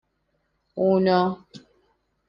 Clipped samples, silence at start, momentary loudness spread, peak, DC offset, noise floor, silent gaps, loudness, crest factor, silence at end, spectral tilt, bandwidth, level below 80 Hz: under 0.1%; 0.75 s; 19 LU; -8 dBFS; under 0.1%; -72 dBFS; none; -22 LUFS; 18 dB; 0.7 s; -8.5 dB/octave; 6 kHz; -64 dBFS